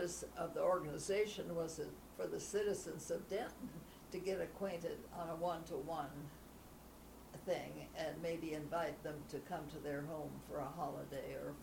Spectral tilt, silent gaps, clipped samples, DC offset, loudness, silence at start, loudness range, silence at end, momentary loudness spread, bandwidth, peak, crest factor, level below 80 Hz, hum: -5 dB/octave; none; under 0.1%; under 0.1%; -44 LUFS; 0 s; 5 LU; 0 s; 13 LU; 19.5 kHz; -26 dBFS; 18 dB; -64 dBFS; none